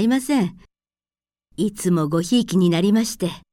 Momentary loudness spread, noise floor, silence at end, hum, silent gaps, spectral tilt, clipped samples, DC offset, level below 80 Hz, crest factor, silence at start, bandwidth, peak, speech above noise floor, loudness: 9 LU; under -90 dBFS; 0.15 s; none; none; -5.5 dB/octave; under 0.1%; under 0.1%; -54 dBFS; 14 dB; 0 s; 16.5 kHz; -8 dBFS; over 71 dB; -20 LUFS